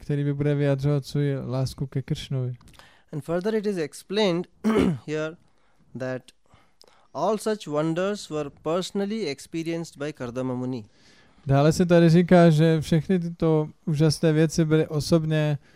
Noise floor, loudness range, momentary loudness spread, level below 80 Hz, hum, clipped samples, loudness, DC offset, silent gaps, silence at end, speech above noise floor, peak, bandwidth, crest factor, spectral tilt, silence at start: -63 dBFS; 9 LU; 14 LU; -52 dBFS; none; under 0.1%; -24 LUFS; under 0.1%; none; 0.2 s; 39 dB; -4 dBFS; 14.5 kHz; 20 dB; -7 dB/octave; 0 s